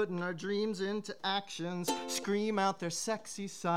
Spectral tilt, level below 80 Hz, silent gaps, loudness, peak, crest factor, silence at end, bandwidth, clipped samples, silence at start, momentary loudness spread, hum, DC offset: -4 dB/octave; -82 dBFS; none; -35 LUFS; -18 dBFS; 16 dB; 0 s; 16.5 kHz; under 0.1%; 0 s; 5 LU; none; 0.2%